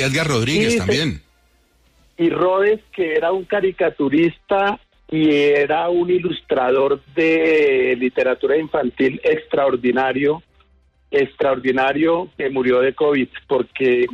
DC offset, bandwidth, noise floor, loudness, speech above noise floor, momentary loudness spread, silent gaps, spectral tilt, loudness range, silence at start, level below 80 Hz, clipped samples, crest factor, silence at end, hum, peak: under 0.1%; 13 kHz; -58 dBFS; -18 LUFS; 40 dB; 6 LU; none; -5.5 dB/octave; 3 LU; 0 s; -50 dBFS; under 0.1%; 10 dB; 0 s; none; -8 dBFS